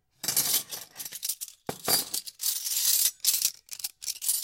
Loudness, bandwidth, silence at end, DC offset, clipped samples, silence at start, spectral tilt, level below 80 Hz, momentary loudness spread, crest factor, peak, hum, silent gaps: -26 LUFS; 17 kHz; 0 s; under 0.1%; under 0.1%; 0.25 s; 1 dB/octave; -72 dBFS; 14 LU; 22 dB; -8 dBFS; none; none